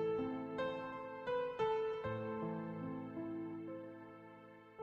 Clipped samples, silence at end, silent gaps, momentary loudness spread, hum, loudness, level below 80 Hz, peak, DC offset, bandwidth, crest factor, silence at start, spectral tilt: under 0.1%; 0 s; none; 17 LU; none; -42 LUFS; -72 dBFS; -28 dBFS; under 0.1%; 7.4 kHz; 16 dB; 0 s; -8 dB/octave